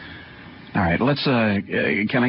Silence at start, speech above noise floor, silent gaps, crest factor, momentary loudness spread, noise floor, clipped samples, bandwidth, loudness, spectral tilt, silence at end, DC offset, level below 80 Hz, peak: 0 s; 21 dB; none; 16 dB; 20 LU; -41 dBFS; under 0.1%; 5.8 kHz; -21 LUFS; -11 dB/octave; 0 s; under 0.1%; -44 dBFS; -6 dBFS